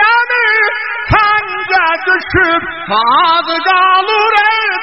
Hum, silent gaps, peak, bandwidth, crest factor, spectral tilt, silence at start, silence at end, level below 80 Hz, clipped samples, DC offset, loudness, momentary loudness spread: none; none; 0 dBFS; 6.2 kHz; 12 dB; -0.5 dB/octave; 0 s; 0 s; -34 dBFS; under 0.1%; 0.6%; -10 LUFS; 5 LU